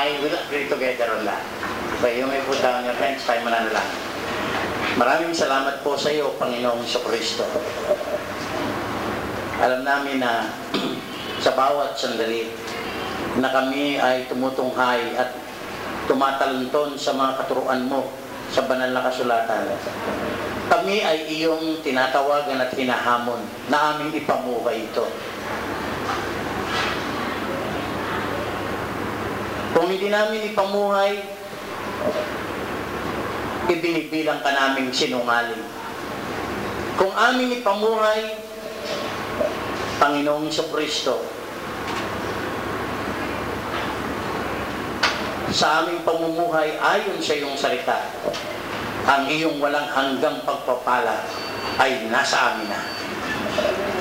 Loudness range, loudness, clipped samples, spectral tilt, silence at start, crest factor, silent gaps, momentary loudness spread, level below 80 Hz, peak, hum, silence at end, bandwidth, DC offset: 4 LU; -23 LUFS; under 0.1%; -4 dB/octave; 0 s; 18 dB; none; 8 LU; -50 dBFS; -6 dBFS; none; 0 s; 16 kHz; under 0.1%